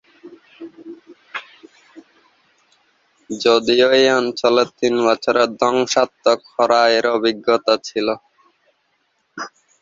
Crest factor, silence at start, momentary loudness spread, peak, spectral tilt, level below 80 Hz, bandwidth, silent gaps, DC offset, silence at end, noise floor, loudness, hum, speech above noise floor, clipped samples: 18 dB; 0.25 s; 19 LU; -2 dBFS; -3 dB/octave; -64 dBFS; 7.8 kHz; none; under 0.1%; 0.35 s; -66 dBFS; -16 LUFS; none; 50 dB; under 0.1%